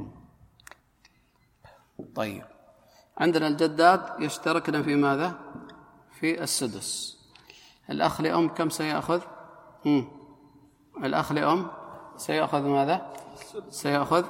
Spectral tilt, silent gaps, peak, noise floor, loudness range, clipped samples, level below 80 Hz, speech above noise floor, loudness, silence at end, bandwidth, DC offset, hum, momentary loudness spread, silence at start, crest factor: -4.5 dB/octave; none; -6 dBFS; -65 dBFS; 5 LU; under 0.1%; -64 dBFS; 39 dB; -27 LUFS; 0 s; 16.5 kHz; under 0.1%; none; 19 LU; 0 s; 24 dB